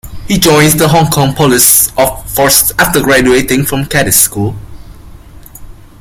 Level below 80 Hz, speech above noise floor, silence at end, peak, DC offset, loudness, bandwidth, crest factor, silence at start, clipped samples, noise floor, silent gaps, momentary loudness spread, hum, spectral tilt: -30 dBFS; 23 dB; 0.3 s; 0 dBFS; under 0.1%; -8 LUFS; over 20 kHz; 10 dB; 0.05 s; 0.5%; -32 dBFS; none; 7 LU; none; -3.5 dB/octave